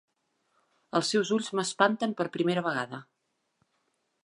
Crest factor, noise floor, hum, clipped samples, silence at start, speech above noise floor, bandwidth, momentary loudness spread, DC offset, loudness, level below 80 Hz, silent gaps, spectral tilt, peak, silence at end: 24 dB; -78 dBFS; none; under 0.1%; 0.95 s; 50 dB; 11.5 kHz; 8 LU; under 0.1%; -29 LUFS; -82 dBFS; none; -4 dB/octave; -8 dBFS; 1.2 s